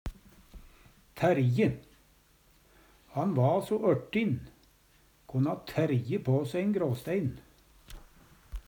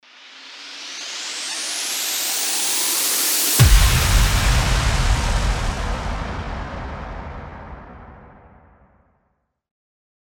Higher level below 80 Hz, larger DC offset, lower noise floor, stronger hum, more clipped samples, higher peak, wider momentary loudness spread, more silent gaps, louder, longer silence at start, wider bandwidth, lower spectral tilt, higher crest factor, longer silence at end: second, -52 dBFS vs -24 dBFS; neither; second, -63 dBFS vs -70 dBFS; neither; neither; second, -14 dBFS vs -2 dBFS; second, 11 LU vs 20 LU; neither; second, -30 LUFS vs -19 LUFS; second, 0.05 s vs 0.2 s; about the same, 20 kHz vs over 20 kHz; first, -8 dB/octave vs -2.5 dB/octave; about the same, 18 dB vs 20 dB; second, 0.1 s vs 2.15 s